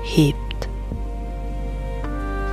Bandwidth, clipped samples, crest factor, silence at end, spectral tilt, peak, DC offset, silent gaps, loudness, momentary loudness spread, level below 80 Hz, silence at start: 14.5 kHz; under 0.1%; 20 dB; 0 s; -6.5 dB/octave; -2 dBFS; under 0.1%; none; -26 LUFS; 12 LU; -28 dBFS; 0 s